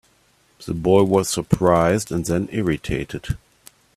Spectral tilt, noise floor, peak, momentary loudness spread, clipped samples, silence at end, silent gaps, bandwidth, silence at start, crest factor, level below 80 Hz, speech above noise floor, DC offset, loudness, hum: -6 dB/octave; -59 dBFS; 0 dBFS; 14 LU; under 0.1%; 0.6 s; none; 15 kHz; 0.6 s; 20 dB; -42 dBFS; 40 dB; under 0.1%; -20 LUFS; none